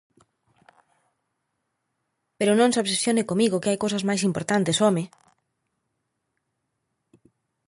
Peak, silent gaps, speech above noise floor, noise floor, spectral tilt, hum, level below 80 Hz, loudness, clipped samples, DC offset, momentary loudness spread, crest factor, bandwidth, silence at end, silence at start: -8 dBFS; none; 56 dB; -78 dBFS; -4.5 dB/octave; none; -68 dBFS; -23 LUFS; under 0.1%; under 0.1%; 5 LU; 18 dB; 11.5 kHz; 2.65 s; 2.4 s